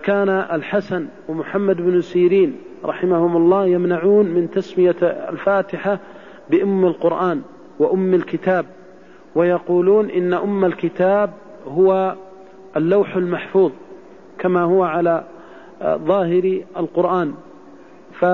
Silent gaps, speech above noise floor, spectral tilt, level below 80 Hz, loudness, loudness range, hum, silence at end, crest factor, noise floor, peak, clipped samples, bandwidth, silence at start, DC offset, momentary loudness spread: none; 27 dB; -9 dB/octave; -62 dBFS; -18 LUFS; 3 LU; none; 0 s; 14 dB; -44 dBFS; -6 dBFS; under 0.1%; 5.6 kHz; 0 s; 0.4%; 11 LU